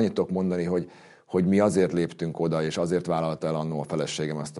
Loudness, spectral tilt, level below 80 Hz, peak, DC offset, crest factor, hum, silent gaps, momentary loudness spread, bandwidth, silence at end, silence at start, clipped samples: -26 LUFS; -6.5 dB/octave; -60 dBFS; -8 dBFS; under 0.1%; 18 dB; none; none; 8 LU; 11.5 kHz; 0 s; 0 s; under 0.1%